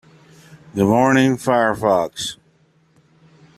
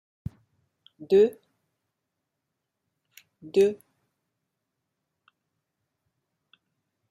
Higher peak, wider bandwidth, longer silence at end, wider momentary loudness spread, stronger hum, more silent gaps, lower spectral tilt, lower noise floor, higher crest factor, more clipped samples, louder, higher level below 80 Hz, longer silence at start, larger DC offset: first, -2 dBFS vs -10 dBFS; first, 14.5 kHz vs 12 kHz; second, 1.25 s vs 3.35 s; second, 13 LU vs 21 LU; neither; neither; about the same, -5.5 dB/octave vs -6.5 dB/octave; second, -57 dBFS vs -83 dBFS; about the same, 18 dB vs 20 dB; neither; first, -17 LUFS vs -23 LUFS; first, -56 dBFS vs -66 dBFS; second, 0.75 s vs 1 s; neither